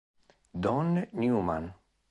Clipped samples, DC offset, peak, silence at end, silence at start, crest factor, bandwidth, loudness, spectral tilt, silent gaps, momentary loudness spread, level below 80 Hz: under 0.1%; under 0.1%; -16 dBFS; 0.35 s; 0.55 s; 16 dB; 9 kHz; -30 LUFS; -9 dB/octave; none; 13 LU; -54 dBFS